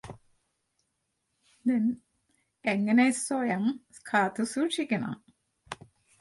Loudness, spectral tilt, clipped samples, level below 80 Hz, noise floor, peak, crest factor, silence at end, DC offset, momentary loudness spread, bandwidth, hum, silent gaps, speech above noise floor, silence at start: -28 LUFS; -4.5 dB/octave; under 0.1%; -70 dBFS; -79 dBFS; -12 dBFS; 20 dB; 0.45 s; under 0.1%; 21 LU; 11.5 kHz; none; none; 52 dB; 0.05 s